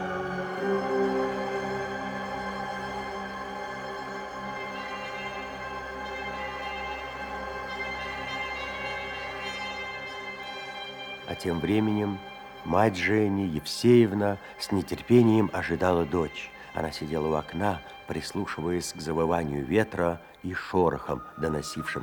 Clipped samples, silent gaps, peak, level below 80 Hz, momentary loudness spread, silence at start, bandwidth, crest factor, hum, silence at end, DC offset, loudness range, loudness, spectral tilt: under 0.1%; none; -8 dBFS; -54 dBFS; 11 LU; 0 s; 20 kHz; 22 dB; none; 0 s; under 0.1%; 10 LU; -29 LUFS; -6 dB/octave